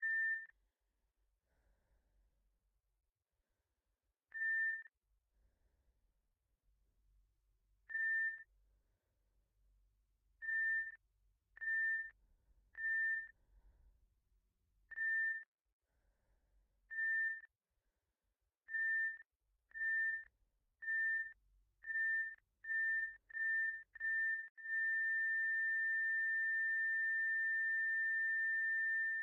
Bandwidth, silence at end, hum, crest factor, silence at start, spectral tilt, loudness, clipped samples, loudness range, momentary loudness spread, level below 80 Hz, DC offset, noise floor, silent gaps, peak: 6 kHz; 0 s; none; 10 dB; 0 s; -1.5 dB/octave; -38 LUFS; under 0.1%; 9 LU; 12 LU; -80 dBFS; under 0.1%; -89 dBFS; 15.48-15.53 s, 15.61-15.65 s, 15.73-15.80 s, 19.36-19.40 s, 24.50-24.55 s; -34 dBFS